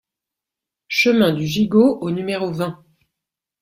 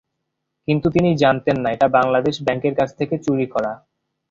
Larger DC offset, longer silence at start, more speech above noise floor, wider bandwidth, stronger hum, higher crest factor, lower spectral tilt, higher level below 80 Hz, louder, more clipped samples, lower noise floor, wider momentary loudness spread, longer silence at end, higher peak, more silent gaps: neither; first, 0.9 s vs 0.7 s; first, 68 dB vs 58 dB; first, 16 kHz vs 7.8 kHz; neither; about the same, 18 dB vs 18 dB; about the same, -6 dB/octave vs -7 dB/octave; second, -56 dBFS vs -50 dBFS; about the same, -18 LUFS vs -19 LUFS; neither; first, -86 dBFS vs -77 dBFS; about the same, 9 LU vs 8 LU; first, 0.85 s vs 0.55 s; about the same, -2 dBFS vs -2 dBFS; neither